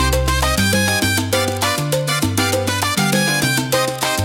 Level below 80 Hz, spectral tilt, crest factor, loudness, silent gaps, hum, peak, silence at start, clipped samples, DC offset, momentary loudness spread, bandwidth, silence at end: -30 dBFS; -3.5 dB/octave; 14 dB; -17 LUFS; none; none; -4 dBFS; 0 s; under 0.1%; under 0.1%; 3 LU; 17 kHz; 0 s